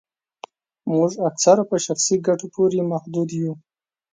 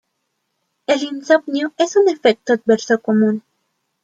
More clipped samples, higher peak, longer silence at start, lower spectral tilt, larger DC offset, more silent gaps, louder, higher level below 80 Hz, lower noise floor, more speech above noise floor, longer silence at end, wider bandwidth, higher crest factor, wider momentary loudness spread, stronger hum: neither; about the same, -2 dBFS vs -2 dBFS; about the same, 0.85 s vs 0.9 s; about the same, -5 dB/octave vs -4.5 dB/octave; neither; neither; second, -20 LUFS vs -17 LUFS; about the same, -68 dBFS vs -68 dBFS; second, -44 dBFS vs -72 dBFS; second, 24 dB vs 56 dB; about the same, 0.55 s vs 0.65 s; about the same, 9.6 kHz vs 8.8 kHz; about the same, 20 dB vs 16 dB; first, 11 LU vs 6 LU; neither